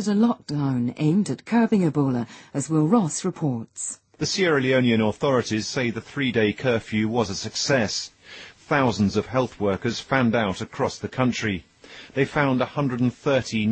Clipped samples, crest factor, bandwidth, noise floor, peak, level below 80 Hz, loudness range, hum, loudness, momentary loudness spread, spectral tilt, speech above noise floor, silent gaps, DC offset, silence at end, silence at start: under 0.1%; 16 dB; 8.8 kHz; -44 dBFS; -6 dBFS; -56 dBFS; 2 LU; none; -23 LUFS; 9 LU; -5.5 dB/octave; 22 dB; none; under 0.1%; 0 s; 0 s